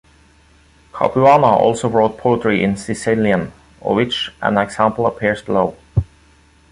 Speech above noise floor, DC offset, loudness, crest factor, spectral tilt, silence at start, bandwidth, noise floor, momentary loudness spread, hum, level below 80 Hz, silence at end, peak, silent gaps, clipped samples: 35 dB; under 0.1%; -16 LUFS; 16 dB; -6 dB/octave; 0.95 s; 11.5 kHz; -50 dBFS; 11 LU; none; -40 dBFS; 0.7 s; 0 dBFS; none; under 0.1%